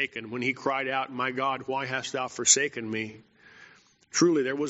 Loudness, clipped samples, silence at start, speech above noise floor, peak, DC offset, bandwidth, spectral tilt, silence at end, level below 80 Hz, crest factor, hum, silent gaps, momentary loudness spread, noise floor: -27 LUFS; under 0.1%; 0 s; 28 dB; -6 dBFS; under 0.1%; 8 kHz; -2.5 dB/octave; 0 s; -72 dBFS; 24 dB; none; none; 12 LU; -56 dBFS